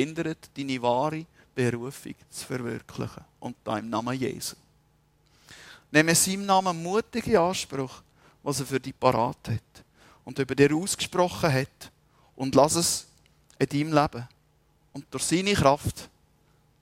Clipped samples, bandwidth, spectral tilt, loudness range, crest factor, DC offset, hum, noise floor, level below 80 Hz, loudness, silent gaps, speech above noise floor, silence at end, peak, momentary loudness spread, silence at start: under 0.1%; 16 kHz; -4 dB/octave; 8 LU; 24 dB; under 0.1%; none; -64 dBFS; -54 dBFS; -26 LUFS; none; 38 dB; 0.75 s; -4 dBFS; 16 LU; 0 s